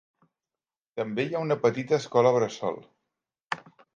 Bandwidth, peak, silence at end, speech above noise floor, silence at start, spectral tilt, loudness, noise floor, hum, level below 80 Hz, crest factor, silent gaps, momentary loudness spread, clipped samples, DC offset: 7.6 kHz; -8 dBFS; 0.4 s; over 64 dB; 0.95 s; -6 dB/octave; -27 LUFS; under -90 dBFS; none; -74 dBFS; 20 dB; 3.42-3.47 s; 14 LU; under 0.1%; under 0.1%